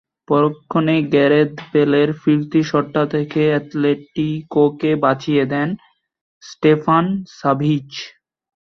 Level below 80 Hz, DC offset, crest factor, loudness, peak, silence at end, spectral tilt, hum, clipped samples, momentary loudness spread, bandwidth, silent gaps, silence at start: -58 dBFS; under 0.1%; 16 dB; -17 LUFS; -2 dBFS; 0.55 s; -7.5 dB/octave; none; under 0.1%; 8 LU; 6.4 kHz; 6.21-6.41 s; 0.3 s